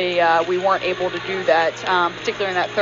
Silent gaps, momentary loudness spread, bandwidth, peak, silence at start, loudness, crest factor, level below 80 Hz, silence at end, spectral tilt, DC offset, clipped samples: none; 6 LU; 7.4 kHz; -4 dBFS; 0 s; -19 LUFS; 16 dB; -58 dBFS; 0 s; -1.5 dB/octave; under 0.1%; under 0.1%